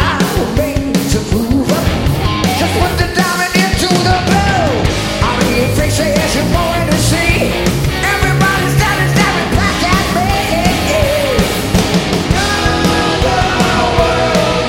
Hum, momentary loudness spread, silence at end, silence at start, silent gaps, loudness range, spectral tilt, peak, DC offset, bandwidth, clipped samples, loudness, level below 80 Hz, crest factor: none; 3 LU; 0 s; 0 s; none; 1 LU; -4.5 dB/octave; 0 dBFS; under 0.1%; 16.5 kHz; under 0.1%; -12 LUFS; -22 dBFS; 12 dB